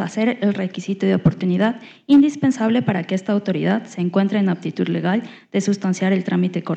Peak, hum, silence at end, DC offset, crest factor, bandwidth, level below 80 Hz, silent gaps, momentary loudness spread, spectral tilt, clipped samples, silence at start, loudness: -6 dBFS; none; 0 s; under 0.1%; 14 dB; 8.4 kHz; -56 dBFS; none; 7 LU; -7 dB/octave; under 0.1%; 0 s; -20 LUFS